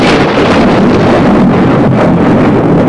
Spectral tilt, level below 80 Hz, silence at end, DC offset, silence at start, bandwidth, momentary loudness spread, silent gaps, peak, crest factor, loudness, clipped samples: -7.5 dB/octave; -30 dBFS; 0 s; 2%; 0 s; 11 kHz; 1 LU; none; 0 dBFS; 6 dB; -7 LUFS; under 0.1%